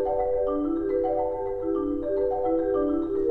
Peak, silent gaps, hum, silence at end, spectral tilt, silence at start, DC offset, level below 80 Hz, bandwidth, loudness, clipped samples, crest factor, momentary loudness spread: -14 dBFS; none; none; 0 s; -10 dB/octave; 0 s; under 0.1%; -44 dBFS; 4 kHz; -26 LUFS; under 0.1%; 10 dB; 3 LU